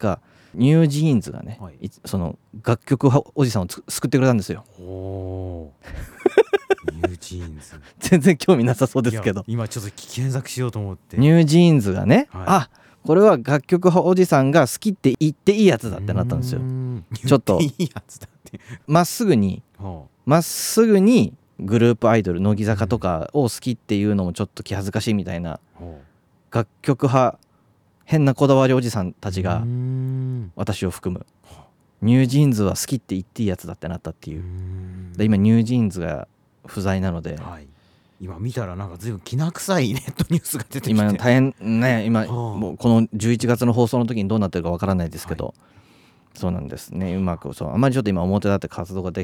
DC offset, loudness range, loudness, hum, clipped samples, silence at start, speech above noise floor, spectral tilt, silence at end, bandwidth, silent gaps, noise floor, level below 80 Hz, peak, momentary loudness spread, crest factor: under 0.1%; 8 LU; -20 LUFS; none; under 0.1%; 0 s; 40 dB; -6.5 dB/octave; 0 s; 19 kHz; none; -59 dBFS; -48 dBFS; -2 dBFS; 17 LU; 18 dB